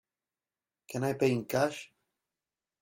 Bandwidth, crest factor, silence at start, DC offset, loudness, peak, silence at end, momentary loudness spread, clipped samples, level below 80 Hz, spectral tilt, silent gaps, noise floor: 16 kHz; 20 dB; 0.9 s; under 0.1%; -31 LUFS; -14 dBFS; 0.95 s; 12 LU; under 0.1%; -72 dBFS; -6 dB/octave; none; under -90 dBFS